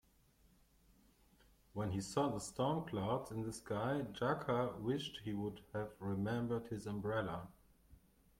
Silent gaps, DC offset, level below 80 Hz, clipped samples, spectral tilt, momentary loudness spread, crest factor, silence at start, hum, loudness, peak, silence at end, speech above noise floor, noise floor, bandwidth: none; under 0.1%; -66 dBFS; under 0.1%; -6 dB/octave; 7 LU; 18 dB; 1.75 s; none; -41 LUFS; -24 dBFS; 0.4 s; 31 dB; -71 dBFS; 16.5 kHz